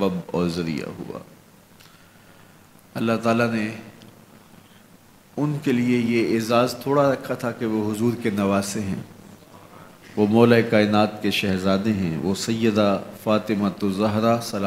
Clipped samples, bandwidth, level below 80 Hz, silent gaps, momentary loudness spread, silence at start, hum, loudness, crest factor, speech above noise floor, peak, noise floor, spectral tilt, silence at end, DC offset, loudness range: under 0.1%; 16 kHz; -60 dBFS; none; 12 LU; 0 s; none; -22 LUFS; 22 dB; 30 dB; -2 dBFS; -51 dBFS; -6 dB/octave; 0 s; under 0.1%; 7 LU